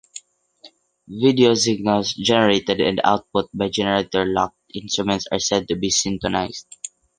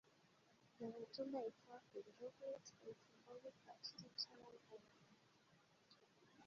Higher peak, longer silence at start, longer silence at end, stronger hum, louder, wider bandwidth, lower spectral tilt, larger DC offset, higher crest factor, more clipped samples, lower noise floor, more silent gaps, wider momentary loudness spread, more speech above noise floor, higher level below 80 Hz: first, -2 dBFS vs -34 dBFS; about the same, 0.15 s vs 0.05 s; first, 0.3 s vs 0 s; neither; first, -20 LUFS vs -54 LUFS; first, 10.5 kHz vs 7.2 kHz; about the same, -3.5 dB/octave vs -3 dB/octave; neither; about the same, 20 dB vs 24 dB; neither; second, -50 dBFS vs -75 dBFS; neither; about the same, 16 LU vs 14 LU; first, 31 dB vs 20 dB; first, -50 dBFS vs under -90 dBFS